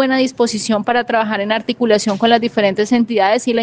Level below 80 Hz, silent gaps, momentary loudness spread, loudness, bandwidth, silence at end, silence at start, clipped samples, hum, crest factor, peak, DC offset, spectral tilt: -58 dBFS; none; 4 LU; -15 LUFS; 9.8 kHz; 0 s; 0 s; under 0.1%; none; 14 dB; -2 dBFS; under 0.1%; -4 dB/octave